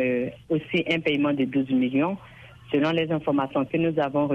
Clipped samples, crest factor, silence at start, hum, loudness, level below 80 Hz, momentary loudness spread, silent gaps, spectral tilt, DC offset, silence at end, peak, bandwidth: under 0.1%; 16 dB; 0 s; none; -25 LUFS; -60 dBFS; 5 LU; none; -8 dB/octave; under 0.1%; 0 s; -8 dBFS; 6.8 kHz